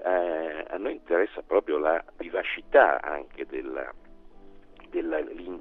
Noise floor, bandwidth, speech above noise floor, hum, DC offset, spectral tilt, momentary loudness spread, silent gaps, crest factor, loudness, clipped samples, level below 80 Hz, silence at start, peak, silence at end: -48 dBFS; 4.1 kHz; 21 dB; none; under 0.1%; -6.5 dB/octave; 15 LU; none; 22 dB; -27 LUFS; under 0.1%; -54 dBFS; 0 s; -6 dBFS; 0 s